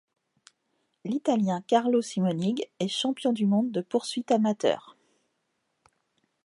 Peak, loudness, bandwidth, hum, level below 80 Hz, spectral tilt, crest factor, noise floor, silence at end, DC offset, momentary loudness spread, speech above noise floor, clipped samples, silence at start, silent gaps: -8 dBFS; -27 LUFS; 11.5 kHz; none; -78 dBFS; -6 dB/octave; 20 dB; -77 dBFS; 1.55 s; under 0.1%; 6 LU; 51 dB; under 0.1%; 1.05 s; none